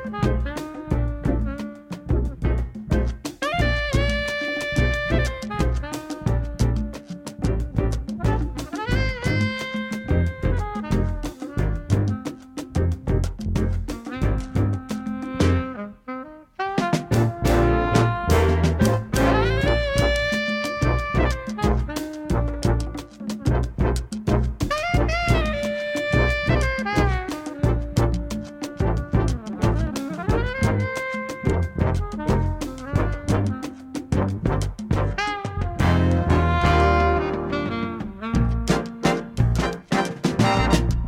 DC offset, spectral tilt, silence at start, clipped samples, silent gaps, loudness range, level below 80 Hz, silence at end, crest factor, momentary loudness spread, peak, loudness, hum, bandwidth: under 0.1%; -6.5 dB/octave; 0 s; under 0.1%; none; 5 LU; -28 dBFS; 0 s; 18 dB; 10 LU; -4 dBFS; -23 LUFS; none; 16.5 kHz